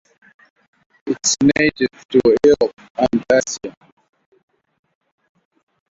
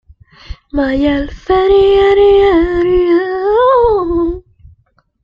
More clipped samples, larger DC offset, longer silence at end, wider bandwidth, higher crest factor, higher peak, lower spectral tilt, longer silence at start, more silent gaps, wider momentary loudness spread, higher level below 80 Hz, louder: neither; neither; first, 2.25 s vs 0.85 s; first, 7.8 kHz vs 5.4 kHz; first, 18 dB vs 10 dB; about the same, -2 dBFS vs -2 dBFS; second, -3.5 dB/octave vs -7.5 dB/octave; first, 1.05 s vs 0.5 s; first, 2.05-2.09 s, 2.73-2.77 s, 2.90-2.95 s vs none; first, 14 LU vs 10 LU; second, -52 dBFS vs -30 dBFS; second, -17 LUFS vs -11 LUFS